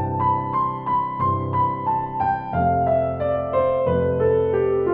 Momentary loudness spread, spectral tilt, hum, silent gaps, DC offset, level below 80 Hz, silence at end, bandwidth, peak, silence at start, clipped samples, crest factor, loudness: 4 LU; -11.5 dB/octave; none; none; under 0.1%; -48 dBFS; 0 s; 4.5 kHz; -8 dBFS; 0 s; under 0.1%; 12 dB; -21 LUFS